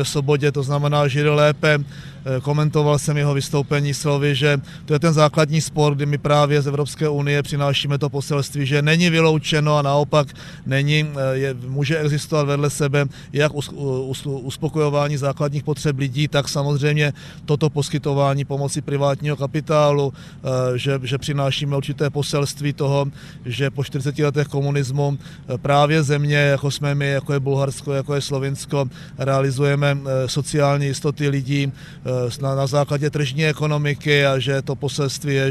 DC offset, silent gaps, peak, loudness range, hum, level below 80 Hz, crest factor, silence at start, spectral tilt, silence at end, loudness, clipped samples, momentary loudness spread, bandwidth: under 0.1%; none; -2 dBFS; 3 LU; none; -50 dBFS; 18 dB; 0 s; -5.5 dB/octave; 0 s; -20 LUFS; under 0.1%; 8 LU; 13.5 kHz